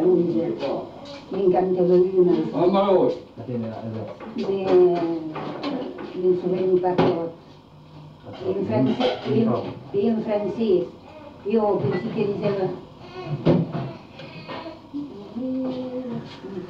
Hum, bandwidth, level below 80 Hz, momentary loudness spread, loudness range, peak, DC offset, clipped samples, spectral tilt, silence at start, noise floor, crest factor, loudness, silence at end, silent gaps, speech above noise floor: none; 6.2 kHz; -58 dBFS; 17 LU; 6 LU; -6 dBFS; under 0.1%; under 0.1%; -9 dB/octave; 0 s; -46 dBFS; 16 dB; -23 LUFS; 0 s; none; 24 dB